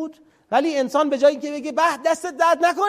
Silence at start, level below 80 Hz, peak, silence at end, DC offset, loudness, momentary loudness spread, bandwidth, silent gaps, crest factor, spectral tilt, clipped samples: 0 s; -70 dBFS; -4 dBFS; 0 s; under 0.1%; -20 LUFS; 7 LU; 14.5 kHz; none; 16 dB; -3 dB/octave; under 0.1%